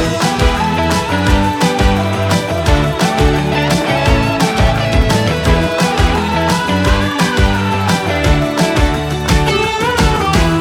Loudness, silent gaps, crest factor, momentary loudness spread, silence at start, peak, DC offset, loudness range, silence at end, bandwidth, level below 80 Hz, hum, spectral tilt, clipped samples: -13 LUFS; none; 12 dB; 2 LU; 0 s; 0 dBFS; under 0.1%; 1 LU; 0 s; 17.5 kHz; -20 dBFS; none; -5 dB/octave; under 0.1%